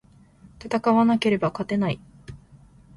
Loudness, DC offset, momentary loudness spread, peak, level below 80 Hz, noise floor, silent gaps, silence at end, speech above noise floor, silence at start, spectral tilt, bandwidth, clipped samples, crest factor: -23 LUFS; under 0.1%; 24 LU; -8 dBFS; -54 dBFS; -52 dBFS; none; 0.6 s; 30 dB; 0.45 s; -7 dB/octave; 11.5 kHz; under 0.1%; 16 dB